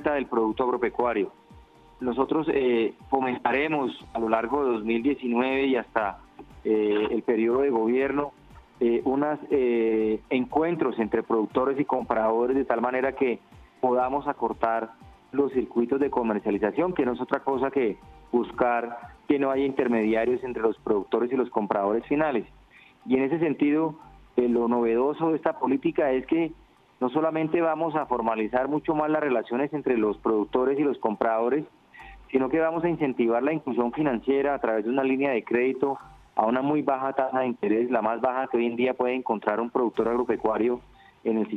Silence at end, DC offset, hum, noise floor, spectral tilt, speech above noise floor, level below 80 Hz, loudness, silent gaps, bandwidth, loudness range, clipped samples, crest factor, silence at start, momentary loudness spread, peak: 0 s; under 0.1%; none; -54 dBFS; -8.5 dB/octave; 29 dB; -56 dBFS; -26 LUFS; none; 5 kHz; 1 LU; under 0.1%; 20 dB; 0 s; 5 LU; -4 dBFS